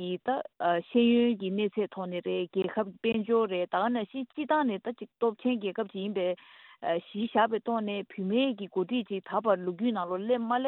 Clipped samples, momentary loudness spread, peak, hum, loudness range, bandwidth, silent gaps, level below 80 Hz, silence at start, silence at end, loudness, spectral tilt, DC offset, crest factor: under 0.1%; 7 LU; -12 dBFS; none; 3 LU; 4.2 kHz; none; -76 dBFS; 0 s; 0 s; -30 LUFS; -9.5 dB/octave; under 0.1%; 18 dB